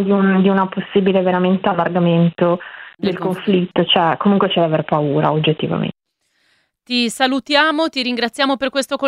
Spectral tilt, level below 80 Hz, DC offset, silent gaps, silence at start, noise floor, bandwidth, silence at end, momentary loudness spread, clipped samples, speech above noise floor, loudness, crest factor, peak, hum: -6 dB/octave; -58 dBFS; under 0.1%; none; 0 s; -66 dBFS; 12.5 kHz; 0 s; 7 LU; under 0.1%; 50 dB; -16 LUFS; 16 dB; 0 dBFS; none